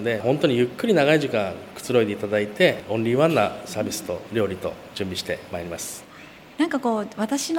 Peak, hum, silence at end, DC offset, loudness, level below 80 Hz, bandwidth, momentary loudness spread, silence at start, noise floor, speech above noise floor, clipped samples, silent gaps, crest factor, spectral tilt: -4 dBFS; none; 0 s; under 0.1%; -23 LUFS; -60 dBFS; 17 kHz; 12 LU; 0 s; -45 dBFS; 22 dB; under 0.1%; none; 20 dB; -5 dB/octave